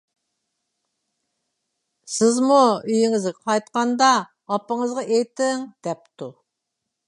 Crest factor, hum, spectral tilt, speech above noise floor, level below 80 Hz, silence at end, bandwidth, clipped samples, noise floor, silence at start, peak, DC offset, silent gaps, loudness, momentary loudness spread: 20 dB; none; -3.5 dB/octave; 60 dB; -76 dBFS; 0.75 s; 11.5 kHz; under 0.1%; -81 dBFS; 2.1 s; -2 dBFS; under 0.1%; none; -21 LUFS; 15 LU